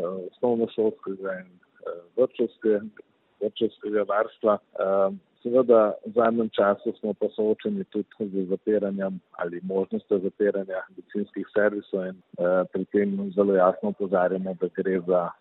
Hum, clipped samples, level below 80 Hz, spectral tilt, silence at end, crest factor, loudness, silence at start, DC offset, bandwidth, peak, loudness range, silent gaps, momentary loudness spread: none; under 0.1%; -74 dBFS; -10.5 dB/octave; 0.1 s; 20 dB; -26 LUFS; 0 s; under 0.1%; 4.1 kHz; -6 dBFS; 5 LU; none; 11 LU